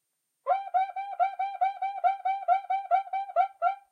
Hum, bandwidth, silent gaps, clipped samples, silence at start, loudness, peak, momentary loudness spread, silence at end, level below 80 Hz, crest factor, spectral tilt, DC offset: none; 4.9 kHz; none; under 0.1%; 0.45 s; -29 LUFS; -14 dBFS; 3 LU; 0.15 s; under -90 dBFS; 16 dB; 1 dB/octave; under 0.1%